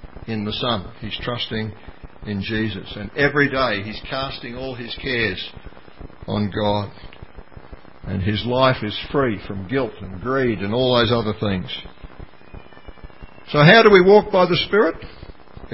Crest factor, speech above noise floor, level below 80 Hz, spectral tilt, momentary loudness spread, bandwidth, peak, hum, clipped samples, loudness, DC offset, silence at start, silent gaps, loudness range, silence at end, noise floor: 20 dB; 23 dB; -42 dBFS; -9 dB/octave; 17 LU; 5.8 kHz; 0 dBFS; none; under 0.1%; -19 LUFS; 0.8%; 0.05 s; none; 10 LU; 0.05 s; -42 dBFS